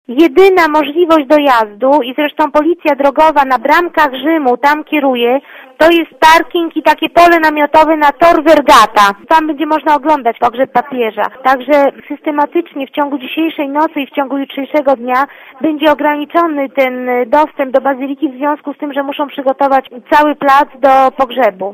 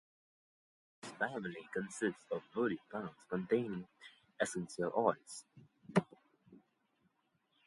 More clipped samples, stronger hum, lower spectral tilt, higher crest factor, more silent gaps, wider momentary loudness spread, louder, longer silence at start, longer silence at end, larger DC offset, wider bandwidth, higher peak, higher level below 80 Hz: first, 1% vs under 0.1%; neither; second, -3.5 dB/octave vs -5.5 dB/octave; second, 10 dB vs 26 dB; neither; second, 10 LU vs 17 LU; first, -11 LUFS vs -39 LUFS; second, 0.1 s vs 1.05 s; second, 0 s vs 1.1 s; neither; first, 16 kHz vs 11.5 kHz; first, 0 dBFS vs -16 dBFS; first, -48 dBFS vs -78 dBFS